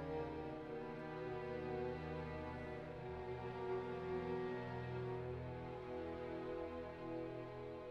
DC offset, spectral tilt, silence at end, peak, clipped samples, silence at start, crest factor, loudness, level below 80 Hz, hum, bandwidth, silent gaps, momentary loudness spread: under 0.1%; -8.5 dB/octave; 0 s; -32 dBFS; under 0.1%; 0 s; 14 dB; -47 LUFS; -62 dBFS; none; 8.2 kHz; none; 5 LU